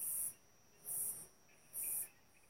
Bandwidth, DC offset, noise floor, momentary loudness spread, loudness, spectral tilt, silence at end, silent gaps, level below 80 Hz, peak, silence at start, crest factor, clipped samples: 16 kHz; under 0.1%; -69 dBFS; 14 LU; -42 LUFS; 0 dB/octave; 0.4 s; none; -80 dBFS; -28 dBFS; 0 s; 18 dB; under 0.1%